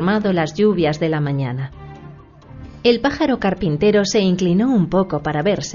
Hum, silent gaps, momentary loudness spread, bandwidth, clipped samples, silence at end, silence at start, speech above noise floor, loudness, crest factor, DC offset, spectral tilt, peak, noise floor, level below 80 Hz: none; none; 10 LU; 7.4 kHz; under 0.1%; 0 s; 0 s; 23 dB; -18 LUFS; 16 dB; under 0.1%; -6 dB/octave; -2 dBFS; -40 dBFS; -42 dBFS